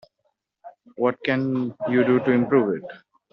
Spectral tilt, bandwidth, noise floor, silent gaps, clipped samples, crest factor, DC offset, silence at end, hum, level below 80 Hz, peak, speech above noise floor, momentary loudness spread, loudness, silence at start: -6 dB/octave; 5.6 kHz; -73 dBFS; none; under 0.1%; 18 dB; under 0.1%; 0.35 s; none; -68 dBFS; -6 dBFS; 52 dB; 7 LU; -22 LUFS; 0.65 s